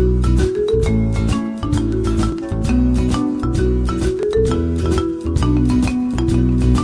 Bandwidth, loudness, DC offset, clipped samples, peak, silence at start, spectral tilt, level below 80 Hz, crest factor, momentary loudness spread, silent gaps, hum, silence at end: 11 kHz; -18 LUFS; under 0.1%; under 0.1%; -4 dBFS; 0 s; -7.5 dB/octave; -22 dBFS; 12 dB; 4 LU; none; none; 0 s